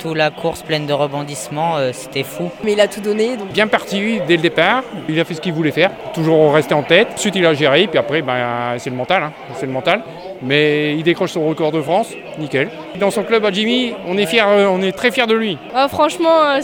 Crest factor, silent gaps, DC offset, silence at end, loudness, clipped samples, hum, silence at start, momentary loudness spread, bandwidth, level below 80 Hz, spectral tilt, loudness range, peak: 16 dB; none; under 0.1%; 0 s; -16 LUFS; under 0.1%; none; 0 s; 9 LU; 18 kHz; -56 dBFS; -5 dB/octave; 4 LU; 0 dBFS